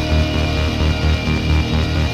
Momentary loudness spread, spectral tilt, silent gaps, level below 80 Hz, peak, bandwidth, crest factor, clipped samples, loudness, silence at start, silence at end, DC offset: 1 LU; -6 dB/octave; none; -20 dBFS; -6 dBFS; 12 kHz; 12 dB; under 0.1%; -18 LUFS; 0 s; 0 s; under 0.1%